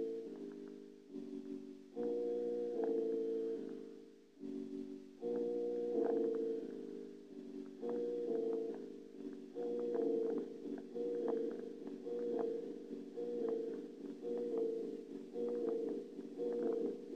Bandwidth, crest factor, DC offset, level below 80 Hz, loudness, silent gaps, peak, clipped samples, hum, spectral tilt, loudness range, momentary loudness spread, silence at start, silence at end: 8.2 kHz; 16 dB; under 0.1%; -84 dBFS; -42 LUFS; none; -26 dBFS; under 0.1%; none; -7.5 dB/octave; 2 LU; 13 LU; 0 s; 0 s